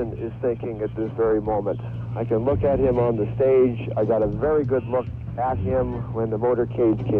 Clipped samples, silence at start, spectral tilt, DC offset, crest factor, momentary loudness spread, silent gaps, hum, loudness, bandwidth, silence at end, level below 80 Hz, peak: under 0.1%; 0 s; -11.5 dB/octave; under 0.1%; 12 dB; 8 LU; none; none; -23 LUFS; 3.9 kHz; 0 s; -40 dBFS; -10 dBFS